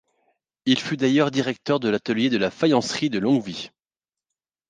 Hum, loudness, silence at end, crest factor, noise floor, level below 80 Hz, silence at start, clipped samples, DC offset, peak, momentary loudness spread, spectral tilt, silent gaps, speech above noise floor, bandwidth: none; -22 LUFS; 1 s; 20 dB; under -90 dBFS; -64 dBFS; 0.65 s; under 0.1%; under 0.1%; -4 dBFS; 8 LU; -5 dB/octave; none; over 68 dB; 9.6 kHz